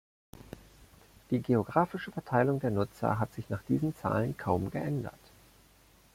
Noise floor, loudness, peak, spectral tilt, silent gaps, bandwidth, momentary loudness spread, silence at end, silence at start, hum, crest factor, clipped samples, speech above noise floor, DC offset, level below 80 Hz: -61 dBFS; -32 LUFS; -12 dBFS; -8.5 dB/octave; none; 16.5 kHz; 14 LU; 1.05 s; 0.35 s; none; 22 dB; under 0.1%; 31 dB; under 0.1%; -60 dBFS